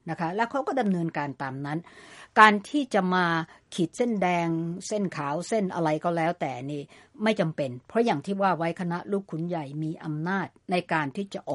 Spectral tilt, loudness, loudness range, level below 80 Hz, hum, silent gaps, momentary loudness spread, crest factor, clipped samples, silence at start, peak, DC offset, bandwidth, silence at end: -6 dB/octave; -27 LUFS; 4 LU; -70 dBFS; none; none; 9 LU; 26 dB; under 0.1%; 0.05 s; 0 dBFS; under 0.1%; 11.5 kHz; 0 s